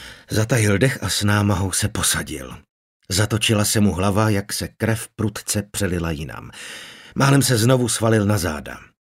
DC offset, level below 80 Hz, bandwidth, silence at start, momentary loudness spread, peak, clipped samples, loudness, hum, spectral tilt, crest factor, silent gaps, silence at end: under 0.1%; -44 dBFS; 16 kHz; 0 s; 16 LU; -2 dBFS; under 0.1%; -20 LUFS; none; -4.5 dB/octave; 18 dB; 2.70-3.00 s; 0.15 s